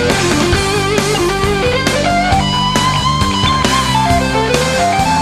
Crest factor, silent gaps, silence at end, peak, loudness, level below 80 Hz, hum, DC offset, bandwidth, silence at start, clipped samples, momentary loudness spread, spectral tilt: 12 dB; none; 0 s; 0 dBFS; -13 LUFS; -26 dBFS; none; under 0.1%; 14 kHz; 0 s; under 0.1%; 1 LU; -4 dB/octave